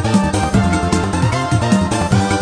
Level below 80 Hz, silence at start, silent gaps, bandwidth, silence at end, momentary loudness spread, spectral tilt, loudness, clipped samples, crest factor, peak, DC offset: -30 dBFS; 0 s; none; 10.5 kHz; 0 s; 2 LU; -5.5 dB/octave; -16 LUFS; under 0.1%; 14 dB; 0 dBFS; under 0.1%